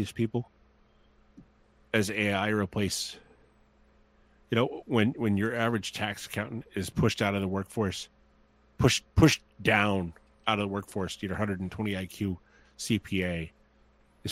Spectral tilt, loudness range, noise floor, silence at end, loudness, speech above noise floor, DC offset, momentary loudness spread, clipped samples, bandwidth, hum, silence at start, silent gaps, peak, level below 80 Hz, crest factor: -5 dB/octave; 5 LU; -63 dBFS; 0 s; -29 LUFS; 34 dB; under 0.1%; 12 LU; under 0.1%; 16 kHz; none; 0 s; none; -6 dBFS; -50 dBFS; 24 dB